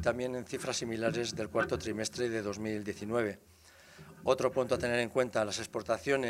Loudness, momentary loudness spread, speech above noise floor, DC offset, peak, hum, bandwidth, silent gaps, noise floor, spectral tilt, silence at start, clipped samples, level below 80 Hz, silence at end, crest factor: -34 LUFS; 7 LU; 23 dB; under 0.1%; -12 dBFS; none; 16 kHz; none; -56 dBFS; -4.5 dB/octave; 0 s; under 0.1%; -62 dBFS; 0 s; 22 dB